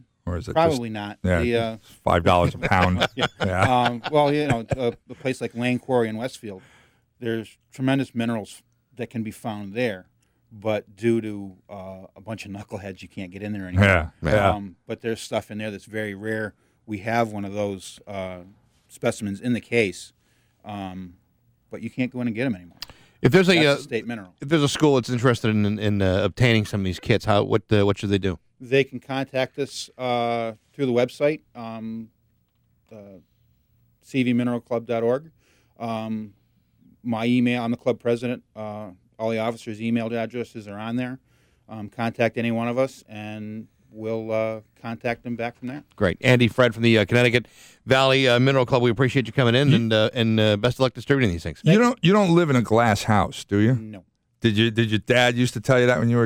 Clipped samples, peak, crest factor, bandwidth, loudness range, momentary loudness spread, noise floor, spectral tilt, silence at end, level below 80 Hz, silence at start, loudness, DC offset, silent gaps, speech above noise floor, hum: under 0.1%; -6 dBFS; 18 dB; 16 kHz; 10 LU; 17 LU; -66 dBFS; -6 dB/octave; 0 s; -48 dBFS; 0.25 s; -22 LUFS; under 0.1%; none; 44 dB; none